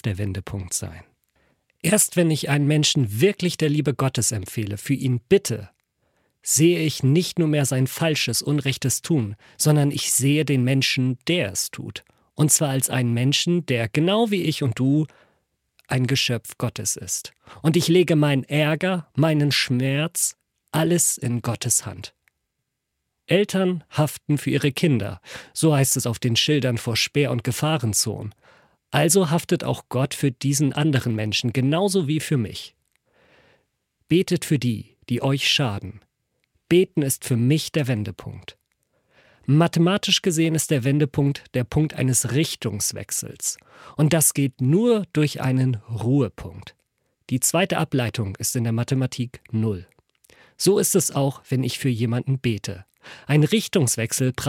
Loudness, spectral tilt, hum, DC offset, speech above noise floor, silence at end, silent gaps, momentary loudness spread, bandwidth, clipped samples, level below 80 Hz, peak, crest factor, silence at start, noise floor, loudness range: -21 LUFS; -4.5 dB/octave; none; under 0.1%; 57 dB; 0 s; none; 10 LU; 16.5 kHz; under 0.1%; -56 dBFS; -4 dBFS; 18 dB; 0.05 s; -79 dBFS; 3 LU